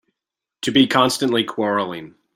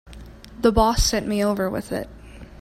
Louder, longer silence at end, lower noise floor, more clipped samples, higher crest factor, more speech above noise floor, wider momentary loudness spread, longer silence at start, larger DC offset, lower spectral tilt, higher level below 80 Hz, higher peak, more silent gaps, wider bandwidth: first, -19 LUFS vs -22 LUFS; first, 0.25 s vs 0 s; first, -85 dBFS vs -41 dBFS; neither; about the same, 18 dB vs 20 dB; first, 67 dB vs 20 dB; second, 12 LU vs 21 LU; first, 0.65 s vs 0.05 s; neither; about the same, -4 dB/octave vs -4.5 dB/octave; second, -60 dBFS vs -32 dBFS; about the same, -2 dBFS vs -4 dBFS; neither; about the same, 16.5 kHz vs 16 kHz